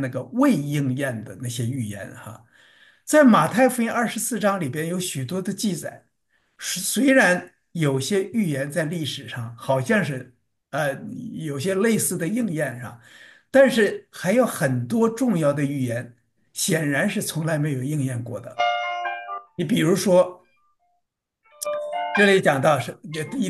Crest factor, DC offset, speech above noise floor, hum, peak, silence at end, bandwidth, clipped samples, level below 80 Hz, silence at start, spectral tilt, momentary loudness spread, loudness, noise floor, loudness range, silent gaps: 20 dB; under 0.1%; 53 dB; none; -4 dBFS; 0 s; 12.5 kHz; under 0.1%; -68 dBFS; 0 s; -5 dB/octave; 15 LU; -22 LUFS; -75 dBFS; 4 LU; none